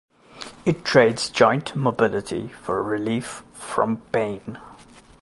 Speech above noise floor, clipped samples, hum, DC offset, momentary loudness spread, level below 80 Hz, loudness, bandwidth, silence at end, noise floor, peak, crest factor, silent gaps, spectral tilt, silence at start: 26 dB; under 0.1%; none; under 0.1%; 18 LU; -56 dBFS; -22 LUFS; 11.5 kHz; 0.45 s; -48 dBFS; -2 dBFS; 22 dB; none; -5 dB/octave; 0.35 s